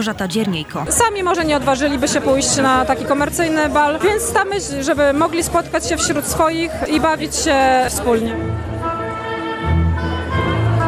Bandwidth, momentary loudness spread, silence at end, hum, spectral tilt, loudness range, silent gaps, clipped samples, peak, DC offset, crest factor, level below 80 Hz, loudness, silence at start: 14 kHz; 8 LU; 0 s; none; -4 dB/octave; 2 LU; none; under 0.1%; -2 dBFS; under 0.1%; 14 dB; -32 dBFS; -17 LUFS; 0 s